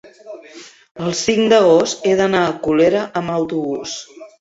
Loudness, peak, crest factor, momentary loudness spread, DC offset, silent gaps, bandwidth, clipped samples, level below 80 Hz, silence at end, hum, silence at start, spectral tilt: -16 LUFS; -2 dBFS; 16 dB; 20 LU; under 0.1%; 0.91-0.95 s; 8 kHz; under 0.1%; -54 dBFS; 0.15 s; none; 0.05 s; -4.5 dB/octave